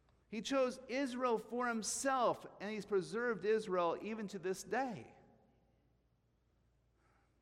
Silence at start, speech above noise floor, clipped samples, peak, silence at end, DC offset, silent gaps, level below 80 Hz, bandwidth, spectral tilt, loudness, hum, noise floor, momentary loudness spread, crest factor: 0.3 s; 39 dB; under 0.1%; -22 dBFS; 2.3 s; under 0.1%; none; -76 dBFS; 16 kHz; -3.5 dB/octave; -38 LUFS; none; -77 dBFS; 9 LU; 18 dB